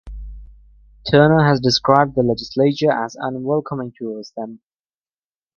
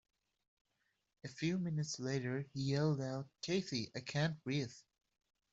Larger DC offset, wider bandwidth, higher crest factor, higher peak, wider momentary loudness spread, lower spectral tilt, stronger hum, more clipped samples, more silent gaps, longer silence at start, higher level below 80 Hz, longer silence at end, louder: neither; second, 7.2 kHz vs 8 kHz; about the same, 18 dB vs 18 dB; first, 0 dBFS vs -22 dBFS; first, 18 LU vs 8 LU; about the same, -6 dB/octave vs -5.5 dB/octave; neither; neither; neither; second, 0.05 s vs 1.25 s; first, -42 dBFS vs -74 dBFS; first, 1 s vs 0.7 s; first, -17 LUFS vs -40 LUFS